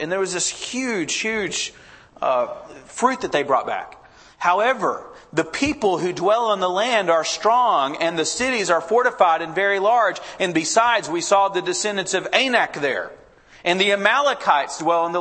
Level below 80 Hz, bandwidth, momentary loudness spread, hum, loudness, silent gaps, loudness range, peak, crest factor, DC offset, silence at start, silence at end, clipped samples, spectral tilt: -58 dBFS; 8.8 kHz; 8 LU; none; -20 LUFS; none; 4 LU; -2 dBFS; 18 dB; under 0.1%; 0 s; 0 s; under 0.1%; -2.5 dB/octave